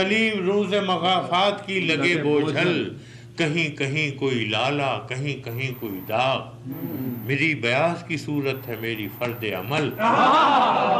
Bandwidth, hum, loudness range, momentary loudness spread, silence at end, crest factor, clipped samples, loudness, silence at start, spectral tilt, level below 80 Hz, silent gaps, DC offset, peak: 15 kHz; none; 4 LU; 10 LU; 0 s; 12 dB; under 0.1%; -23 LUFS; 0 s; -5.5 dB/octave; -62 dBFS; none; under 0.1%; -10 dBFS